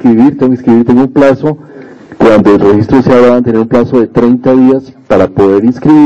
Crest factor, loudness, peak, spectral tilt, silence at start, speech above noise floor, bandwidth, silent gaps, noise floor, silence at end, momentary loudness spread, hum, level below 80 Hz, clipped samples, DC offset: 6 dB; -7 LUFS; 0 dBFS; -8.5 dB/octave; 0 s; 24 dB; 7.6 kHz; none; -29 dBFS; 0 s; 5 LU; none; -36 dBFS; 7%; under 0.1%